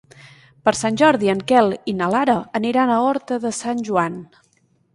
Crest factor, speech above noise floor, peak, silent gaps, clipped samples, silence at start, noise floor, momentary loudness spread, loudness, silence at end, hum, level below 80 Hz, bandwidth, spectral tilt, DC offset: 18 dB; 43 dB; -2 dBFS; none; under 0.1%; 0.65 s; -61 dBFS; 8 LU; -19 LUFS; 0.7 s; none; -58 dBFS; 11.5 kHz; -5 dB/octave; under 0.1%